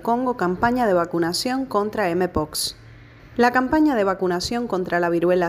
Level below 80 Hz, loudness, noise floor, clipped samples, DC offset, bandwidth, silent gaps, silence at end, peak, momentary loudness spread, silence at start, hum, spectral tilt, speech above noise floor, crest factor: -46 dBFS; -21 LUFS; -45 dBFS; under 0.1%; under 0.1%; 15.5 kHz; none; 0 s; -4 dBFS; 6 LU; 0 s; none; -4.5 dB/octave; 24 dB; 16 dB